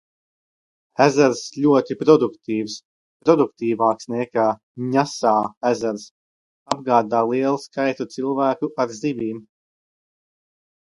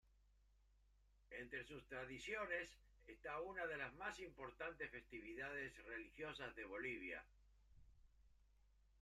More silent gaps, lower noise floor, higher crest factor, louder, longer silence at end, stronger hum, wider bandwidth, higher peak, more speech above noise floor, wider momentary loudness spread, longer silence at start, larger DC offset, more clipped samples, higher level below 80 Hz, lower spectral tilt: first, 2.85-3.20 s, 4.63-4.75 s, 5.57-5.61 s, 6.11-6.66 s vs none; first, under -90 dBFS vs -75 dBFS; about the same, 20 dB vs 20 dB; first, -20 LUFS vs -51 LUFS; first, 1.55 s vs 0 s; neither; second, 11.5 kHz vs 13.5 kHz; first, 0 dBFS vs -32 dBFS; first, over 70 dB vs 24 dB; first, 11 LU vs 8 LU; first, 1 s vs 0.05 s; neither; neither; about the same, -68 dBFS vs -72 dBFS; about the same, -5.5 dB/octave vs -4.5 dB/octave